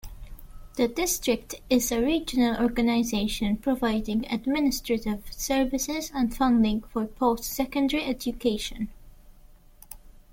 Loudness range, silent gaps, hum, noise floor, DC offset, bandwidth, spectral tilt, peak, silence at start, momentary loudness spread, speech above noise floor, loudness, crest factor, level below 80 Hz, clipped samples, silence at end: 3 LU; none; none; -52 dBFS; under 0.1%; 17 kHz; -4 dB/octave; -10 dBFS; 0.05 s; 9 LU; 26 dB; -26 LUFS; 16 dB; -44 dBFS; under 0.1%; 0.25 s